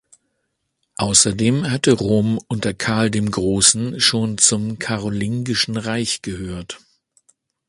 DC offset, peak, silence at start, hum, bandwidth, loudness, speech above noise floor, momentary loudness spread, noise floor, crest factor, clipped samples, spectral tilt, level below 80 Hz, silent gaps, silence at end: under 0.1%; 0 dBFS; 1 s; none; 11.5 kHz; -18 LUFS; 54 dB; 14 LU; -73 dBFS; 20 dB; under 0.1%; -3.5 dB/octave; -46 dBFS; none; 0.9 s